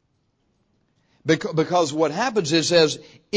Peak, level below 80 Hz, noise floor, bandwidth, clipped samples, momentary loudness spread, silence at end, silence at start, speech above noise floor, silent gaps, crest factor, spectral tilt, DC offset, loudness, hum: -4 dBFS; -64 dBFS; -68 dBFS; 8 kHz; under 0.1%; 5 LU; 0 s; 1.25 s; 48 dB; none; 18 dB; -4 dB/octave; under 0.1%; -21 LUFS; none